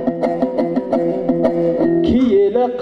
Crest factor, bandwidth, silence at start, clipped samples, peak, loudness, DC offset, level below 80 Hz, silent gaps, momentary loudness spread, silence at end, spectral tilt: 14 dB; 6.2 kHz; 0 s; under 0.1%; -2 dBFS; -16 LUFS; under 0.1%; -42 dBFS; none; 5 LU; 0 s; -9 dB/octave